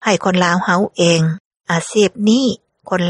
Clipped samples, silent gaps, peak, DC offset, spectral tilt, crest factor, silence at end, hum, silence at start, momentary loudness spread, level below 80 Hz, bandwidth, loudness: under 0.1%; 1.40-1.51 s; 0 dBFS; under 0.1%; -5 dB/octave; 16 dB; 0 s; none; 0 s; 8 LU; -58 dBFS; 11.5 kHz; -15 LUFS